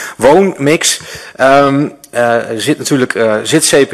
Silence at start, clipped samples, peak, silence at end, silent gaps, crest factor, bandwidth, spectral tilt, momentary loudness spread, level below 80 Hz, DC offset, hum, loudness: 0 s; under 0.1%; 0 dBFS; 0 s; none; 10 dB; 14.5 kHz; -3.5 dB/octave; 7 LU; -48 dBFS; under 0.1%; none; -11 LUFS